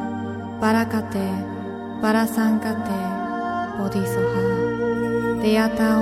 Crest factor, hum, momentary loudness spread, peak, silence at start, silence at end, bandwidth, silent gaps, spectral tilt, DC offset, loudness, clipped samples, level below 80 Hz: 16 dB; none; 9 LU; -6 dBFS; 0 s; 0 s; 15.5 kHz; none; -6.5 dB/octave; under 0.1%; -23 LUFS; under 0.1%; -50 dBFS